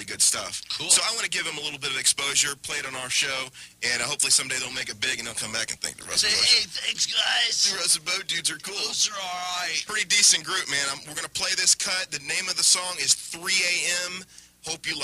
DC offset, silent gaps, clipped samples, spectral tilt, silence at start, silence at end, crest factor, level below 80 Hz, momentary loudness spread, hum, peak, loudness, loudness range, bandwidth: under 0.1%; none; under 0.1%; 1 dB/octave; 0 s; 0 s; 18 dB; -64 dBFS; 10 LU; none; -8 dBFS; -23 LUFS; 3 LU; 15.5 kHz